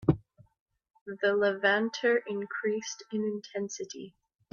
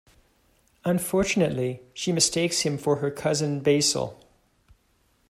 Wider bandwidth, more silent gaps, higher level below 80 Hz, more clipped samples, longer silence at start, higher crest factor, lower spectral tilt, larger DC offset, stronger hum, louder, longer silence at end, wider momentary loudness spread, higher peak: second, 7.4 kHz vs 15.5 kHz; first, 0.60-0.66 s, 0.90-0.94 s, 1.01-1.06 s vs none; about the same, -58 dBFS vs -56 dBFS; neither; second, 0 s vs 0.85 s; about the same, 22 dB vs 20 dB; about the same, -5 dB/octave vs -4 dB/octave; neither; neither; second, -30 LUFS vs -24 LUFS; second, 0.45 s vs 1.15 s; first, 17 LU vs 9 LU; second, -10 dBFS vs -6 dBFS